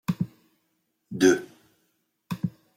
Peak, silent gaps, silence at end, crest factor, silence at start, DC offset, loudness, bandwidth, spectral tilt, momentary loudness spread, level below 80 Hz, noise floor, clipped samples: -6 dBFS; none; 0.3 s; 22 dB; 0.1 s; under 0.1%; -26 LUFS; 16.5 kHz; -5.5 dB/octave; 16 LU; -66 dBFS; -74 dBFS; under 0.1%